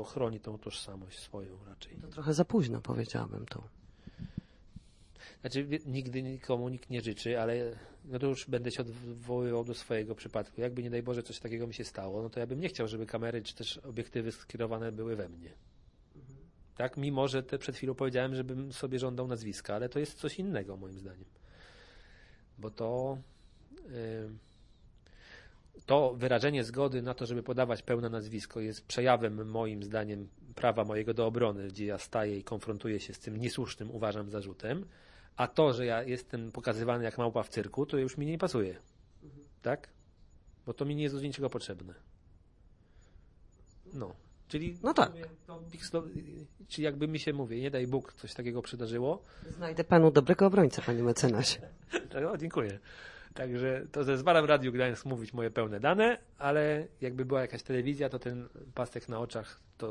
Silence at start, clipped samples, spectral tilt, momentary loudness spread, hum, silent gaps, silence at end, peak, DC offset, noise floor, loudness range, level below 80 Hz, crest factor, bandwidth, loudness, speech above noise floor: 0 s; under 0.1%; -6 dB/octave; 17 LU; none; none; 0 s; -8 dBFS; under 0.1%; -61 dBFS; 11 LU; -60 dBFS; 26 dB; 11.5 kHz; -34 LUFS; 28 dB